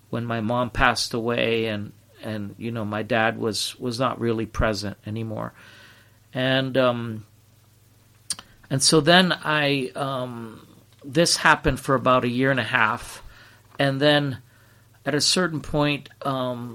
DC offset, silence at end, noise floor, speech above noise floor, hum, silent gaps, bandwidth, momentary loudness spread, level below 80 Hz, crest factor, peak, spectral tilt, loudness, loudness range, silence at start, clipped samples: under 0.1%; 0 s; -56 dBFS; 33 dB; none; none; 16.5 kHz; 15 LU; -44 dBFS; 22 dB; -2 dBFS; -4 dB/octave; -22 LUFS; 6 LU; 0.1 s; under 0.1%